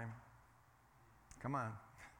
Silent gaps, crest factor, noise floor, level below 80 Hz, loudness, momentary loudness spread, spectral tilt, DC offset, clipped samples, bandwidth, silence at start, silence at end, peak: none; 22 dB; -69 dBFS; -72 dBFS; -47 LUFS; 26 LU; -7 dB/octave; under 0.1%; under 0.1%; 17 kHz; 0 s; 0 s; -28 dBFS